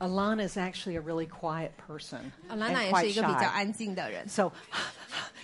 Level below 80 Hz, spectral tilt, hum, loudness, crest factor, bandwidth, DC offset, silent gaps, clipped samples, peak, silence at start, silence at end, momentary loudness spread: -62 dBFS; -4.5 dB/octave; none; -31 LUFS; 20 dB; 11.5 kHz; under 0.1%; none; under 0.1%; -12 dBFS; 0 s; 0 s; 14 LU